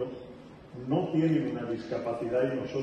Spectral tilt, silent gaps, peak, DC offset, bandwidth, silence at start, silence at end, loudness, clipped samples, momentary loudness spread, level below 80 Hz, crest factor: -8.5 dB/octave; none; -14 dBFS; under 0.1%; 9 kHz; 0 s; 0 s; -30 LUFS; under 0.1%; 19 LU; -62 dBFS; 16 dB